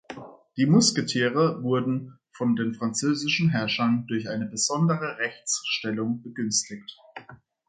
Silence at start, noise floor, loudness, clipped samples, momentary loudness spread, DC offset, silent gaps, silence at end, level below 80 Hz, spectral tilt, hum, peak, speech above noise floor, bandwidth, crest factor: 0.1 s; -50 dBFS; -25 LUFS; under 0.1%; 19 LU; under 0.1%; none; 0.35 s; -68 dBFS; -4 dB/octave; none; -8 dBFS; 25 dB; 9.4 kHz; 18 dB